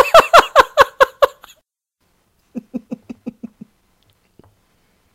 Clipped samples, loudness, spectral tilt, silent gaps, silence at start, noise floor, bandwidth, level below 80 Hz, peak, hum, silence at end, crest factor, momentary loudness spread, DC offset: 0.4%; -12 LUFS; -2.5 dB/octave; none; 0 s; -68 dBFS; 17.5 kHz; -46 dBFS; 0 dBFS; none; 1.7 s; 16 dB; 25 LU; under 0.1%